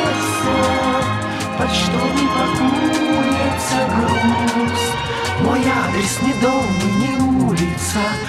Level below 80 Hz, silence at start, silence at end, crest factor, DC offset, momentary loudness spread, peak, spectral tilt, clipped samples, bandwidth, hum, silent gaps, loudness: -38 dBFS; 0 s; 0 s; 12 dB; under 0.1%; 3 LU; -6 dBFS; -4.5 dB/octave; under 0.1%; 15.5 kHz; none; none; -17 LUFS